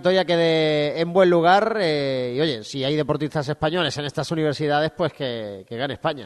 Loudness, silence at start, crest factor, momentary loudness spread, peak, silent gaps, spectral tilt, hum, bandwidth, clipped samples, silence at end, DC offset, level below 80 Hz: -21 LUFS; 0 s; 16 dB; 10 LU; -4 dBFS; none; -6 dB/octave; none; 12 kHz; under 0.1%; 0 s; under 0.1%; -56 dBFS